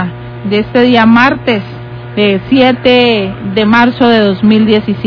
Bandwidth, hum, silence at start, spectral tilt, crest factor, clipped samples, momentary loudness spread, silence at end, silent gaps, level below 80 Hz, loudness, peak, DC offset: 5.4 kHz; none; 0 s; -7.5 dB/octave; 10 dB; 2%; 11 LU; 0 s; none; -40 dBFS; -9 LUFS; 0 dBFS; under 0.1%